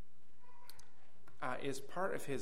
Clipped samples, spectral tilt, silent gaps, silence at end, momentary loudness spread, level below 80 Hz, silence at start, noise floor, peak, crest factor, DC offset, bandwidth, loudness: under 0.1%; -4.5 dB/octave; none; 0 s; 20 LU; -74 dBFS; 0.5 s; -70 dBFS; -24 dBFS; 20 dB; 1%; 16 kHz; -42 LUFS